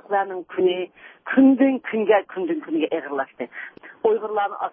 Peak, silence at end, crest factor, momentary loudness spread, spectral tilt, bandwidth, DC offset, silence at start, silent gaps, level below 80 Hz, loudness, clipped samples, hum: -4 dBFS; 0.05 s; 18 dB; 17 LU; -10 dB/octave; 3.6 kHz; under 0.1%; 0.1 s; none; -72 dBFS; -22 LUFS; under 0.1%; none